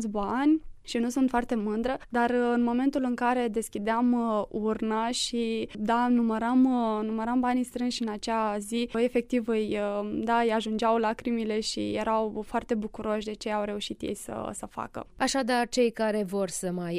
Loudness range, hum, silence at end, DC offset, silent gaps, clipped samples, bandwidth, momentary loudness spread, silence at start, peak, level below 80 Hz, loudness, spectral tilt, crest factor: 4 LU; none; 0 s; under 0.1%; none; under 0.1%; 13.5 kHz; 7 LU; 0 s; -14 dBFS; -54 dBFS; -28 LUFS; -4.5 dB/octave; 14 dB